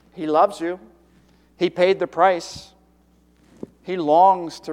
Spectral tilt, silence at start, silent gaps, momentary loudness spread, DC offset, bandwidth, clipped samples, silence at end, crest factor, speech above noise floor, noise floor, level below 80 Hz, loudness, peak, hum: -5 dB/octave; 0.15 s; none; 22 LU; under 0.1%; 12.5 kHz; under 0.1%; 0 s; 18 dB; 38 dB; -57 dBFS; -60 dBFS; -19 LUFS; -2 dBFS; none